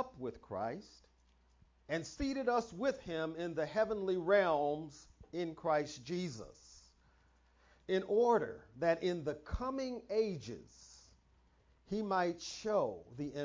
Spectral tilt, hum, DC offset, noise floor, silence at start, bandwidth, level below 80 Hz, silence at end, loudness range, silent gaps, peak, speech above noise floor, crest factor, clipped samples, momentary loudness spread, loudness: -5.5 dB/octave; none; under 0.1%; -70 dBFS; 0 s; 7.6 kHz; -60 dBFS; 0 s; 5 LU; none; -18 dBFS; 33 dB; 20 dB; under 0.1%; 15 LU; -37 LUFS